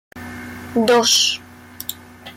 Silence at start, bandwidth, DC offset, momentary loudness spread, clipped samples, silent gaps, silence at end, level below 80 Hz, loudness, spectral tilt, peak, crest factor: 0.15 s; 17 kHz; under 0.1%; 20 LU; under 0.1%; none; 0.05 s; -58 dBFS; -16 LUFS; -1.5 dB/octave; -4 dBFS; 16 dB